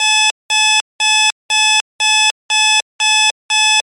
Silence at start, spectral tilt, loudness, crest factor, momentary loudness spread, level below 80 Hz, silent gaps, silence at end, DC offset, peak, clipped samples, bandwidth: 0 s; 7 dB/octave; -12 LUFS; 12 dB; 2 LU; -76 dBFS; 0.31-0.49 s, 0.81-0.99 s, 1.32-1.49 s, 1.81-1.99 s, 2.31-2.49 s, 2.82-2.99 s, 3.31-3.49 s; 0.15 s; under 0.1%; -2 dBFS; under 0.1%; 17 kHz